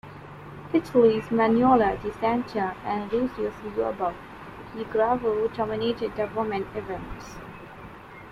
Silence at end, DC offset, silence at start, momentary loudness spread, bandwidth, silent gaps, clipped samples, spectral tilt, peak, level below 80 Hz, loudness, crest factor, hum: 0 s; under 0.1%; 0.05 s; 22 LU; 12 kHz; none; under 0.1%; -7 dB/octave; -8 dBFS; -50 dBFS; -25 LUFS; 18 dB; none